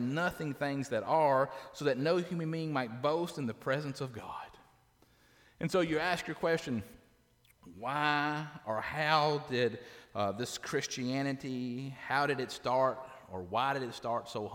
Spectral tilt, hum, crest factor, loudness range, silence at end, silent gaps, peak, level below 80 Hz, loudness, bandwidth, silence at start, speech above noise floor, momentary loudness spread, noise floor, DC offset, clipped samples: -5 dB/octave; none; 20 dB; 4 LU; 0 s; none; -14 dBFS; -68 dBFS; -34 LUFS; 19 kHz; 0 s; 34 dB; 12 LU; -67 dBFS; under 0.1%; under 0.1%